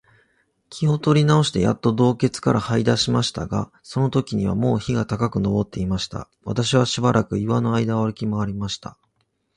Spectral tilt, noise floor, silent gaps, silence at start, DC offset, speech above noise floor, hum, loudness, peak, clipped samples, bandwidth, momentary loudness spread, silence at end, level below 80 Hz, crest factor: -6 dB/octave; -70 dBFS; none; 0.7 s; under 0.1%; 49 dB; none; -21 LUFS; -4 dBFS; under 0.1%; 11 kHz; 10 LU; 0.65 s; -46 dBFS; 18 dB